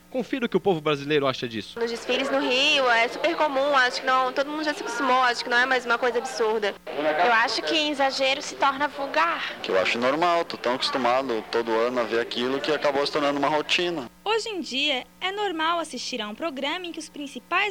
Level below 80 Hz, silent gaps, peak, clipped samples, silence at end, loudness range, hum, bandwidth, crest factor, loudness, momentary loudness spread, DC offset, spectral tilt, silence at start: -64 dBFS; none; -8 dBFS; under 0.1%; 0 s; 3 LU; none; 17 kHz; 16 dB; -24 LUFS; 9 LU; under 0.1%; -3 dB/octave; 0.1 s